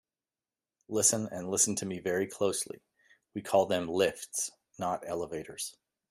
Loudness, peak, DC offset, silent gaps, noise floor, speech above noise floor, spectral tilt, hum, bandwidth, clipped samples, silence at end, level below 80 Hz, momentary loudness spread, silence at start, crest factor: -31 LUFS; -10 dBFS; under 0.1%; none; under -90 dBFS; over 59 dB; -3 dB/octave; none; 15.5 kHz; under 0.1%; 0.4 s; -70 dBFS; 13 LU; 0.9 s; 24 dB